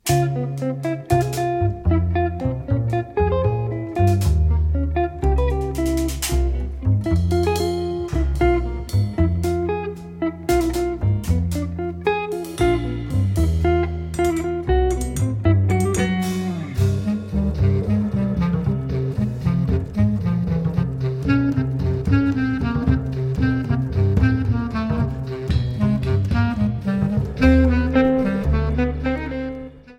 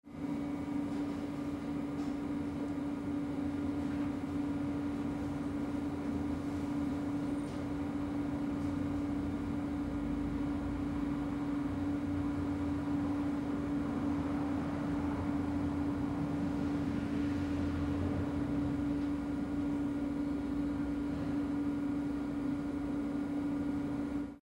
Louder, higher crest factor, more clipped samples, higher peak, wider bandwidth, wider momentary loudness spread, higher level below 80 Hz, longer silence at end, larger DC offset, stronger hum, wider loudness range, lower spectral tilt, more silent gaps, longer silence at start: first, -21 LUFS vs -36 LUFS; about the same, 16 dB vs 12 dB; neither; first, -2 dBFS vs -24 dBFS; first, 17 kHz vs 10.5 kHz; first, 6 LU vs 3 LU; first, -28 dBFS vs -50 dBFS; about the same, 0.05 s vs 0.05 s; neither; neither; about the same, 2 LU vs 2 LU; about the same, -7 dB/octave vs -8 dB/octave; neither; about the same, 0.05 s vs 0.05 s